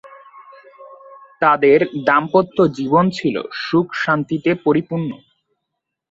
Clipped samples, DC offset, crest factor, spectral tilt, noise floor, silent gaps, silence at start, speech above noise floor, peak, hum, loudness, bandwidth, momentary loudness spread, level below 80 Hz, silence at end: under 0.1%; under 0.1%; 16 dB; -7 dB/octave; -79 dBFS; none; 0.05 s; 62 dB; -2 dBFS; none; -17 LUFS; 7.8 kHz; 10 LU; -58 dBFS; 0.95 s